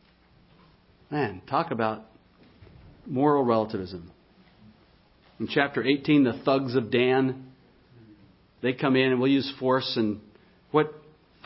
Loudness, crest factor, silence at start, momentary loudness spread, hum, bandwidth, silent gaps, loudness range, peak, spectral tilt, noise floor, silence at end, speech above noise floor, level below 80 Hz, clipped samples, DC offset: -25 LUFS; 20 dB; 1.1 s; 12 LU; none; 5.8 kHz; none; 4 LU; -6 dBFS; -10 dB/octave; -59 dBFS; 0.5 s; 35 dB; -62 dBFS; under 0.1%; under 0.1%